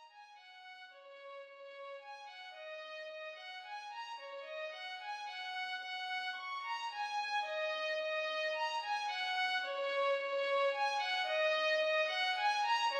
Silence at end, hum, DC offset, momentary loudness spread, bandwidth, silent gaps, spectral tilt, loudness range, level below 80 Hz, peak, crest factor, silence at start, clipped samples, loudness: 0 s; none; under 0.1%; 19 LU; 12.5 kHz; none; 2.5 dB/octave; 14 LU; under -90 dBFS; -22 dBFS; 16 dB; 0 s; under 0.1%; -37 LUFS